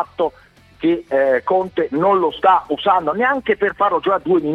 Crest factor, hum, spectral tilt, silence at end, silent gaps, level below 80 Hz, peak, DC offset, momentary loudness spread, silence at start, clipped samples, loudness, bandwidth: 16 dB; none; -7 dB/octave; 0 s; none; -54 dBFS; -2 dBFS; under 0.1%; 6 LU; 0 s; under 0.1%; -17 LUFS; 5.6 kHz